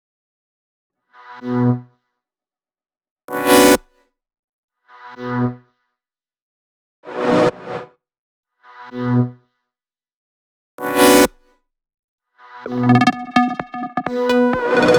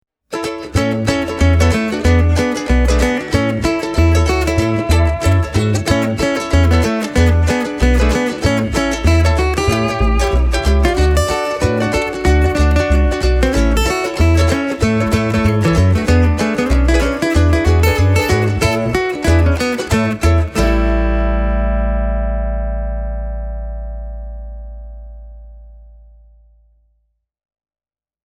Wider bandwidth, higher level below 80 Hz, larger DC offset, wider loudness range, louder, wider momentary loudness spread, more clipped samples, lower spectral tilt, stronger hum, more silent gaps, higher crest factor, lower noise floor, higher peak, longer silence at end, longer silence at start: first, over 20 kHz vs 15.5 kHz; second, -52 dBFS vs -18 dBFS; neither; about the same, 10 LU vs 8 LU; about the same, -17 LUFS vs -15 LUFS; first, 19 LU vs 10 LU; neither; about the same, -5 dB/octave vs -6 dB/octave; neither; first, 3.11-3.16 s, 3.24-3.28 s, 4.39-4.68 s, 6.42-7.03 s, 8.18-8.43 s, 10.14-10.78 s, 11.99-12.18 s vs none; first, 20 dB vs 14 dB; about the same, under -90 dBFS vs under -90 dBFS; about the same, 0 dBFS vs 0 dBFS; second, 0 s vs 2.45 s; first, 1.3 s vs 0.3 s